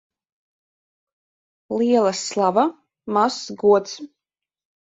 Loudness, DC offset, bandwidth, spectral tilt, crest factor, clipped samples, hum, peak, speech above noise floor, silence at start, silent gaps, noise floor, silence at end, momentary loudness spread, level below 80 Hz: -20 LUFS; under 0.1%; 8 kHz; -4.5 dB/octave; 18 dB; under 0.1%; none; -4 dBFS; 69 dB; 1.7 s; none; -88 dBFS; 0.8 s; 14 LU; -68 dBFS